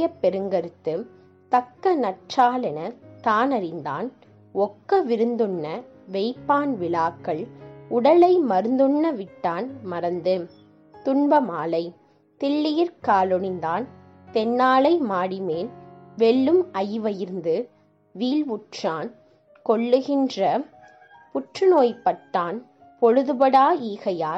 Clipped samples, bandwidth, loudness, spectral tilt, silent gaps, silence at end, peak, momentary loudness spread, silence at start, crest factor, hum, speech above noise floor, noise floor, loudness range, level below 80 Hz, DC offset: under 0.1%; 7.8 kHz; -23 LUFS; -6.5 dB/octave; none; 0 s; -6 dBFS; 14 LU; 0 s; 16 dB; none; 29 dB; -50 dBFS; 4 LU; -70 dBFS; under 0.1%